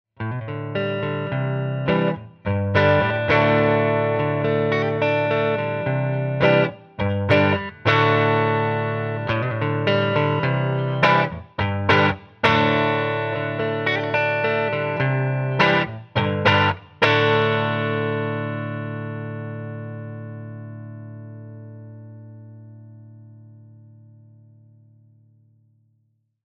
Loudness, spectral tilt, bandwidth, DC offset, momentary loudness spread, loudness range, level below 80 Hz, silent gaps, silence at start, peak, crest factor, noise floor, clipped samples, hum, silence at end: -21 LUFS; -7.5 dB/octave; 6.8 kHz; under 0.1%; 17 LU; 14 LU; -54 dBFS; none; 0.2 s; -2 dBFS; 20 dB; -67 dBFS; under 0.1%; none; 2.85 s